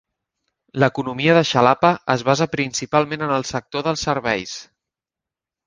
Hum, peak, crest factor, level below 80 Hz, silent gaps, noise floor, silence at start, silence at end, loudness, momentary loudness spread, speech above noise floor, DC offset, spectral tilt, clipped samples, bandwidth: none; 0 dBFS; 20 dB; -54 dBFS; none; -88 dBFS; 0.75 s; 1.05 s; -19 LUFS; 9 LU; 69 dB; under 0.1%; -5 dB/octave; under 0.1%; 10 kHz